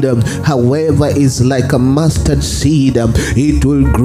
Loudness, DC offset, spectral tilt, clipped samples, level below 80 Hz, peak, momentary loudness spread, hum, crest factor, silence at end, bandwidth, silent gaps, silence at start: -12 LUFS; under 0.1%; -6.5 dB/octave; under 0.1%; -22 dBFS; 0 dBFS; 3 LU; none; 10 dB; 0 s; 15.5 kHz; none; 0 s